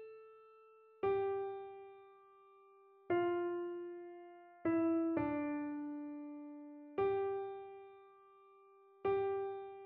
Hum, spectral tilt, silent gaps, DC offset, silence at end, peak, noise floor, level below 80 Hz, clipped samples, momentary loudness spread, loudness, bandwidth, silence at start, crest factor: none; -6 dB/octave; none; under 0.1%; 0 s; -24 dBFS; -65 dBFS; -76 dBFS; under 0.1%; 20 LU; -39 LUFS; 3.8 kHz; 0 s; 16 dB